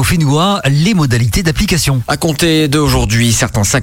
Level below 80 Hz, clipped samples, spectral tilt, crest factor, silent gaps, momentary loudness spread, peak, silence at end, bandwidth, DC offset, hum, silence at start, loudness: -26 dBFS; under 0.1%; -4.5 dB/octave; 10 dB; none; 2 LU; -2 dBFS; 0 s; 17 kHz; under 0.1%; none; 0 s; -12 LUFS